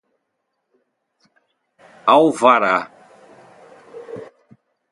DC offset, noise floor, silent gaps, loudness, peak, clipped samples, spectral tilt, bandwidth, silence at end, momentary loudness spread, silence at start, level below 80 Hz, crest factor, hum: under 0.1%; -74 dBFS; none; -15 LUFS; 0 dBFS; under 0.1%; -4.5 dB/octave; 11.5 kHz; 0.65 s; 23 LU; 2.05 s; -72 dBFS; 20 dB; none